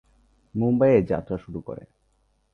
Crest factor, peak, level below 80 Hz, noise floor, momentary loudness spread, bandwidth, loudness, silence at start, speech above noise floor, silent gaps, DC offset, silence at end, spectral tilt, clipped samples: 18 dB; -6 dBFS; -50 dBFS; -67 dBFS; 19 LU; 6.2 kHz; -23 LUFS; 0.55 s; 44 dB; none; under 0.1%; 0.75 s; -10.5 dB/octave; under 0.1%